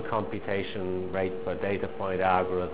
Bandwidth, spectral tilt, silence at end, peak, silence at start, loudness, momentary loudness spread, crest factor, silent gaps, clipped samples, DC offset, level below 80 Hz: 4 kHz; -5 dB/octave; 0 s; -8 dBFS; 0 s; -30 LUFS; 6 LU; 22 dB; none; under 0.1%; 1%; -50 dBFS